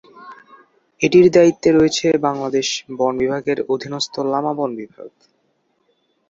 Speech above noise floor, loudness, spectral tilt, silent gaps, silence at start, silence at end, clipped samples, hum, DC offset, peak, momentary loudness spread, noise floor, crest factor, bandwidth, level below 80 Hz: 49 dB; -17 LUFS; -5 dB/octave; none; 0.15 s; 1.2 s; under 0.1%; none; under 0.1%; -2 dBFS; 12 LU; -65 dBFS; 18 dB; 7.8 kHz; -54 dBFS